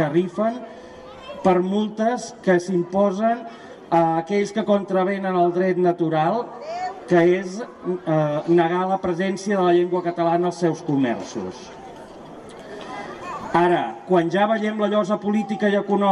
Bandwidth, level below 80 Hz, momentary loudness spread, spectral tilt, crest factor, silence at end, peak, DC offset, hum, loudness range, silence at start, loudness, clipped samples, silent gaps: 10.5 kHz; -60 dBFS; 19 LU; -6.5 dB/octave; 16 dB; 0 s; -6 dBFS; under 0.1%; none; 4 LU; 0 s; -21 LUFS; under 0.1%; none